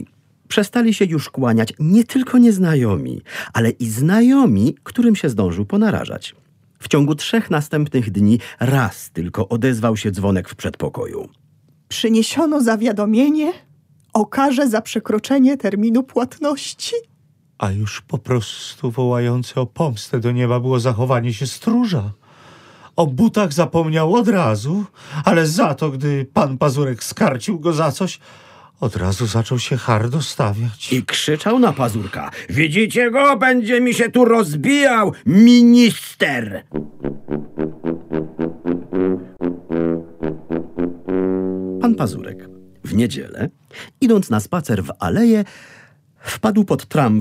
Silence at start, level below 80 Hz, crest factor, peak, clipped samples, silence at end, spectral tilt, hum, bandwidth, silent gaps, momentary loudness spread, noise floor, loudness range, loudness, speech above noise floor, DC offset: 0 s; -50 dBFS; 18 dB; 0 dBFS; under 0.1%; 0 s; -6 dB/octave; none; 15.5 kHz; none; 13 LU; -56 dBFS; 8 LU; -17 LUFS; 39 dB; under 0.1%